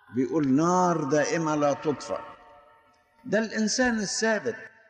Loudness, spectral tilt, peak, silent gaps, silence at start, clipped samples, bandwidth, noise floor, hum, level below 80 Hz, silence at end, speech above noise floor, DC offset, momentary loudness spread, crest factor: -26 LUFS; -4.5 dB/octave; -12 dBFS; none; 0.1 s; under 0.1%; 9.8 kHz; -61 dBFS; none; -62 dBFS; 0.2 s; 36 dB; under 0.1%; 11 LU; 14 dB